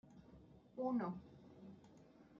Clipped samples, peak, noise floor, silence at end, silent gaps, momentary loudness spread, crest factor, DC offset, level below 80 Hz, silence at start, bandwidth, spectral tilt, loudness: under 0.1%; -30 dBFS; -65 dBFS; 0 s; none; 23 LU; 18 dB; under 0.1%; -76 dBFS; 0.05 s; 7 kHz; -8 dB/octave; -44 LUFS